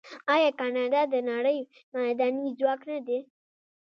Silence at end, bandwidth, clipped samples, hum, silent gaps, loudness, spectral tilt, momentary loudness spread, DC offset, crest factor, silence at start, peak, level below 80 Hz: 0.65 s; 6.6 kHz; under 0.1%; none; 1.83-1.92 s; -28 LUFS; -4.5 dB/octave; 9 LU; under 0.1%; 18 dB; 0.05 s; -10 dBFS; -86 dBFS